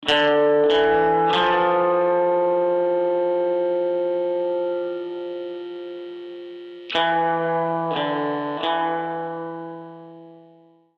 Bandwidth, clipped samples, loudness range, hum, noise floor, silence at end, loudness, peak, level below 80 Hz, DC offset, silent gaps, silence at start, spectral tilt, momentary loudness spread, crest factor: 8 kHz; under 0.1%; 7 LU; none; -53 dBFS; 0.6 s; -21 LUFS; -6 dBFS; -60 dBFS; under 0.1%; none; 0 s; -6 dB/octave; 17 LU; 14 dB